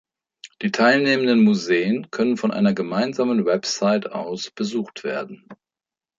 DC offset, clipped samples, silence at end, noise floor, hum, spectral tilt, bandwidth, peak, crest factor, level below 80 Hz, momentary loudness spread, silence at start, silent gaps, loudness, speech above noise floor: under 0.1%; under 0.1%; 0.65 s; under -90 dBFS; none; -5 dB/octave; 7.6 kHz; -4 dBFS; 18 dB; -68 dBFS; 12 LU; 0.45 s; none; -21 LUFS; over 70 dB